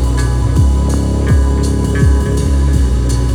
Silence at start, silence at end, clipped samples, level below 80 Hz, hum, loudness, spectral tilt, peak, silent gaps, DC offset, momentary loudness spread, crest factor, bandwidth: 0 s; 0 s; under 0.1%; -14 dBFS; none; -13 LUFS; -6.5 dB/octave; 0 dBFS; none; under 0.1%; 2 LU; 10 dB; 12 kHz